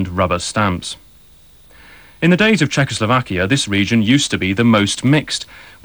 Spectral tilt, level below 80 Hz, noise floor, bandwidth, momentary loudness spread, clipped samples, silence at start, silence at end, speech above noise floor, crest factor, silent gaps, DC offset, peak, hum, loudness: -5 dB/octave; -44 dBFS; -46 dBFS; over 20 kHz; 10 LU; under 0.1%; 0 s; 0.2 s; 30 dB; 14 dB; none; 0.2%; -2 dBFS; none; -15 LUFS